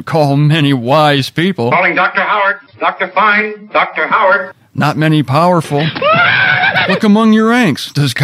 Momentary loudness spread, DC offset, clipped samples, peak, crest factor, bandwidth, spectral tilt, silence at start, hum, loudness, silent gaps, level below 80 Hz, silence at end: 7 LU; under 0.1%; under 0.1%; 0 dBFS; 10 dB; 15 kHz; -6 dB/octave; 0 s; none; -11 LUFS; none; -58 dBFS; 0 s